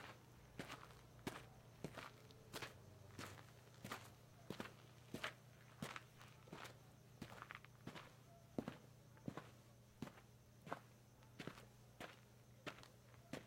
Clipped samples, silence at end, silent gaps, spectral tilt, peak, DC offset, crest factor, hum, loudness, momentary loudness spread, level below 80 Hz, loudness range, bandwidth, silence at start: under 0.1%; 0 s; none; -4.5 dB/octave; -28 dBFS; under 0.1%; 30 dB; none; -57 LUFS; 12 LU; -78 dBFS; 3 LU; 16.5 kHz; 0 s